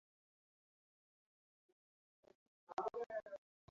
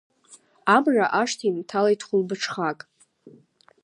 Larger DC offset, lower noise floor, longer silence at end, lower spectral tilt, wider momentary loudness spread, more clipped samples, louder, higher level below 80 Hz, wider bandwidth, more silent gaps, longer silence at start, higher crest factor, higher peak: neither; first, under -90 dBFS vs -56 dBFS; second, 0.35 s vs 0.55 s; second, -3 dB/octave vs -4.5 dB/octave; about the same, 12 LU vs 10 LU; neither; second, -47 LUFS vs -23 LUFS; second, -88 dBFS vs -80 dBFS; second, 7.2 kHz vs 11 kHz; first, 3.06-3.10 s vs none; first, 2.7 s vs 0.3 s; about the same, 24 dB vs 20 dB; second, -28 dBFS vs -4 dBFS